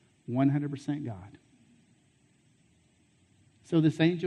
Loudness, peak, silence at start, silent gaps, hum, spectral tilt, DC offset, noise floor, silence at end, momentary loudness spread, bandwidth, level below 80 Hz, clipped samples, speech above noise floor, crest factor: -29 LUFS; -12 dBFS; 0.3 s; none; none; -8 dB/octave; under 0.1%; -66 dBFS; 0 s; 13 LU; 9.6 kHz; -72 dBFS; under 0.1%; 38 dB; 20 dB